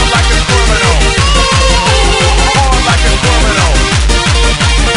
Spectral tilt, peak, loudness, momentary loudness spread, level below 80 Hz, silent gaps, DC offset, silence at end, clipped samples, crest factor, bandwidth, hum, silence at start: -3.5 dB/octave; 0 dBFS; -9 LUFS; 1 LU; -12 dBFS; none; under 0.1%; 0 s; under 0.1%; 8 dB; 11 kHz; none; 0 s